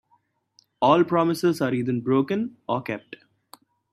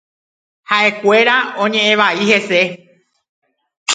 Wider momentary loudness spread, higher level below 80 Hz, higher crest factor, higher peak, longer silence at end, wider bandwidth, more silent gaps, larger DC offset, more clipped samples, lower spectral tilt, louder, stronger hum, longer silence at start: first, 10 LU vs 6 LU; about the same, -68 dBFS vs -68 dBFS; about the same, 20 dB vs 16 dB; second, -6 dBFS vs 0 dBFS; first, 0.75 s vs 0 s; first, 14 kHz vs 9.6 kHz; second, none vs 3.29-3.42 s, 3.77-3.86 s; neither; neither; first, -7 dB/octave vs -3 dB/octave; second, -23 LUFS vs -13 LUFS; neither; about the same, 0.8 s vs 0.7 s